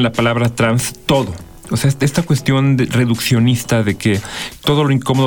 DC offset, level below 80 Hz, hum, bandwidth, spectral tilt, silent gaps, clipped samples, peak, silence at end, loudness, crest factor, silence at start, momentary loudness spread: under 0.1%; -42 dBFS; none; over 20 kHz; -5.5 dB/octave; none; under 0.1%; -2 dBFS; 0 s; -16 LUFS; 12 dB; 0 s; 6 LU